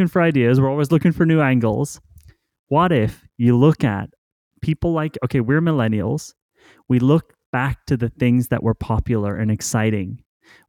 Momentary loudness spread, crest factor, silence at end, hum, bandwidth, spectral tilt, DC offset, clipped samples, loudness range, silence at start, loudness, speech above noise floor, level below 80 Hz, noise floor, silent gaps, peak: 11 LU; 14 dB; 0.5 s; none; 17 kHz; -7 dB/octave; under 0.1%; under 0.1%; 3 LU; 0 s; -19 LUFS; 31 dB; -42 dBFS; -49 dBFS; 2.59-2.67 s, 4.18-4.51 s, 6.42-6.49 s, 7.46-7.53 s; -4 dBFS